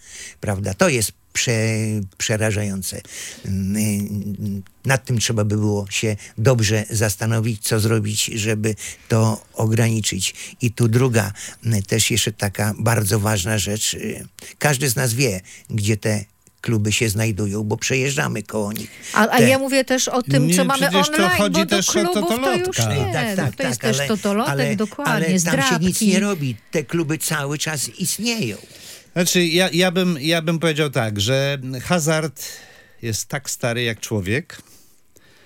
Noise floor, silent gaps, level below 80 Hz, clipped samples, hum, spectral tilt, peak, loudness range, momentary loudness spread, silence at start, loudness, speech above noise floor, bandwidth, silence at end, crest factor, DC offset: -54 dBFS; none; -54 dBFS; under 0.1%; none; -4.5 dB/octave; -2 dBFS; 5 LU; 10 LU; 0.05 s; -20 LUFS; 34 dB; 17 kHz; 0.85 s; 20 dB; under 0.1%